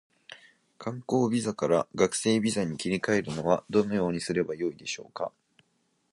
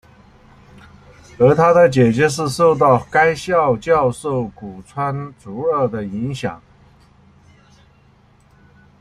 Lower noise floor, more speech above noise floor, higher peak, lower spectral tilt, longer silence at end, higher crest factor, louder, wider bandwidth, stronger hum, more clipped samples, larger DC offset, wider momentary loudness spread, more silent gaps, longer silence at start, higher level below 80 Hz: first, -73 dBFS vs -52 dBFS; first, 45 dB vs 36 dB; second, -8 dBFS vs -2 dBFS; second, -5 dB/octave vs -6.5 dB/octave; second, 0.85 s vs 2.45 s; about the same, 20 dB vs 16 dB; second, -28 LUFS vs -16 LUFS; second, 11.5 kHz vs 13 kHz; neither; neither; neither; second, 12 LU vs 16 LU; neither; second, 0.3 s vs 1.4 s; second, -62 dBFS vs -50 dBFS